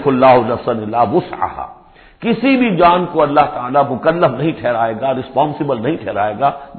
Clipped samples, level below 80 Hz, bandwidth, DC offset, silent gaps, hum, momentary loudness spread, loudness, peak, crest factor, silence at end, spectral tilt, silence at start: under 0.1%; -46 dBFS; 4.5 kHz; under 0.1%; none; none; 9 LU; -15 LUFS; 0 dBFS; 14 dB; 0 s; -10.5 dB/octave; 0 s